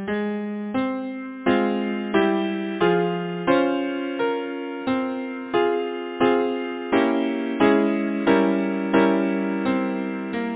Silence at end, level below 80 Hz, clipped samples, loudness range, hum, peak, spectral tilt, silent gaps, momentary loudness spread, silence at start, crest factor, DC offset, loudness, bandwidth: 0 s; -58 dBFS; under 0.1%; 3 LU; none; -4 dBFS; -10.5 dB/octave; none; 8 LU; 0 s; 18 dB; under 0.1%; -23 LUFS; 4 kHz